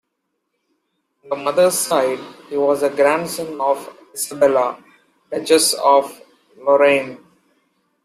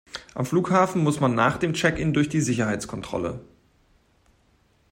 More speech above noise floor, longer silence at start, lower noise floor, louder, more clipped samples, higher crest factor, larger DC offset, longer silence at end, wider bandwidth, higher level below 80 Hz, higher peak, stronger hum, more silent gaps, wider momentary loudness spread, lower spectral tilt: first, 57 dB vs 40 dB; first, 1.25 s vs 0.15 s; first, -74 dBFS vs -63 dBFS; first, -17 LUFS vs -23 LUFS; neither; about the same, 18 dB vs 20 dB; neither; second, 0.9 s vs 1.5 s; about the same, 15.5 kHz vs 16 kHz; second, -66 dBFS vs -50 dBFS; first, -2 dBFS vs -6 dBFS; neither; neither; first, 15 LU vs 10 LU; second, -2.5 dB/octave vs -5.5 dB/octave